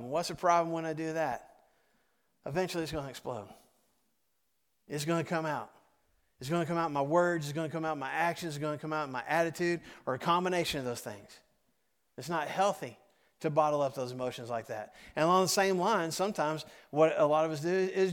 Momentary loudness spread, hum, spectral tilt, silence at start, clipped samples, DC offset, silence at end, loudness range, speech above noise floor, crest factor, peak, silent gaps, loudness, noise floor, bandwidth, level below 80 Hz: 13 LU; none; -5 dB/octave; 0 s; under 0.1%; under 0.1%; 0 s; 9 LU; 48 dB; 20 dB; -12 dBFS; none; -32 LUFS; -80 dBFS; 19 kHz; -68 dBFS